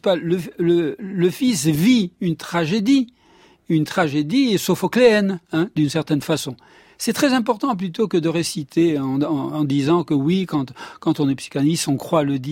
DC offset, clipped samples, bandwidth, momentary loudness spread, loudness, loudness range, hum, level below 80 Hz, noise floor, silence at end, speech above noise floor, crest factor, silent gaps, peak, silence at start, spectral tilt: under 0.1%; under 0.1%; 16.5 kHz; 7 LU; -20 LUFS; 2 LU; none; -58 dBFS; -53 dBFS; 0 s; 33 dB; 16 dB; none; -4 dBFS; 0.05 s; -5.5 dB/octave